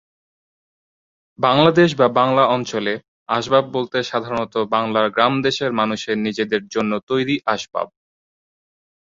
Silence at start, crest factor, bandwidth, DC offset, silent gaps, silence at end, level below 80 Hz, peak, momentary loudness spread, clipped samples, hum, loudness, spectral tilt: 1.4 s; 18 dB; 7.6 kHz; under 0.1%; 3.08-3.26 s, 7.03-7.07 s; 1.3 s; -58 dBFS; -2 dBFS; 9 LU; under 0.1%; none; -19 LUFS; -5.5 dB/octave